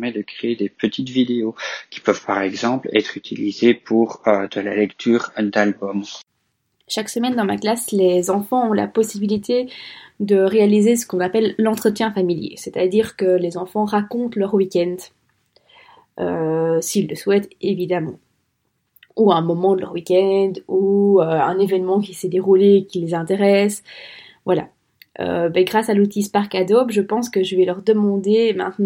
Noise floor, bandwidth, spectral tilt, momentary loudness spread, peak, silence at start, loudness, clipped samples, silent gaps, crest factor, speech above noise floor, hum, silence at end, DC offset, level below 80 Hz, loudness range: -70 dBFS; 16.5 kHz; -5.5 dB/octave; 10 LU; 0 dBFS; 0 s; -19 LUFS; under 0.1%; none; 18 dB; 52 dB; none; 0 s; under 0.1%; -64 dBFS; 5 LU